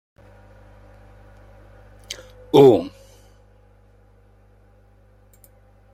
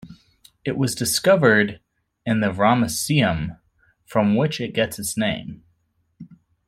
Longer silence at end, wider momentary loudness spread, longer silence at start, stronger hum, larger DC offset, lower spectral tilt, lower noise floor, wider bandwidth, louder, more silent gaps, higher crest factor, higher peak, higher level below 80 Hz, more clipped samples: first, 3.05 s vs 0.35 s; first, 24 LU vs 13 LU; first, 2.1 s vs 0.05 s; first, 50 Hz at -50 dBFS vs none; neither; first, -7 dB/octave vs -4.5 dB/octave; second, -53 dBFS vs -67 dBFS; second, 14.5 kHz vs 16 kHz; first, -15 LUFS vs -21 LUFS; neither; about the same, 22 dB vs 20 dB; about the same, -2 dBFS vs -2 dBFS; about the same, -52 dBFS vs -52 dBFS; neither